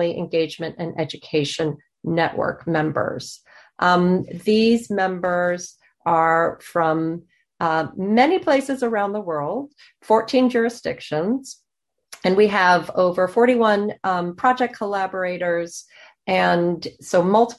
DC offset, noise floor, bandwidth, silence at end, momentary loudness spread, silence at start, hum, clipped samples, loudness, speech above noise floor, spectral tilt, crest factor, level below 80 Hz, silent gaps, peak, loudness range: under 0.1%; -79 dBFS; 12.5 kHz; 0.05 s; 11 LU; 0 s; none; under 0.1%; -21 LUFS; 59 dB; -5.5 dB/octave; 16 dB; -60 dBFS; none; -4 dBFS; 4 LU